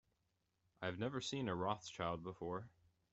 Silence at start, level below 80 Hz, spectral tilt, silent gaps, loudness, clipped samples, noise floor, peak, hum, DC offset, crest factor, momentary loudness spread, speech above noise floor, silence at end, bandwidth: 0.8 s; -74 dBFS; -5 dB/octave; none; -44 LUFS; under 0.1%; -85 dBFS; -24 dBFS; none; under 0.1%; 22 dB; 6 LU; 41 dB; 0.45 s; 8.2 kHz